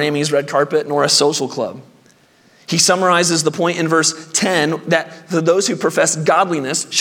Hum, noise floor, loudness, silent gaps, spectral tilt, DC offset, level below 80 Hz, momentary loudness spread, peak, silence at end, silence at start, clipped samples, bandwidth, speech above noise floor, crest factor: none; -51 dBFS; -16 LUFS; none; -3 dB/octave; under 0.1%; -68 dBFS; 7 LU; 0 dBFS; 0 s; 0 s; under 0.1%; 18 kHz; 35 dB; 16 dB